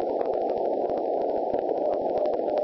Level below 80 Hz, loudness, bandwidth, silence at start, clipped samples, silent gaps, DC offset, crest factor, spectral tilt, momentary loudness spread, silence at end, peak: -60 dBFS; -27 LUFS; 6 kHz; 0 s; under 0.1%; none; under 0.1%; 14 dB; -8.5 dB/octave; 1 LU; 0 s; -12 dBFS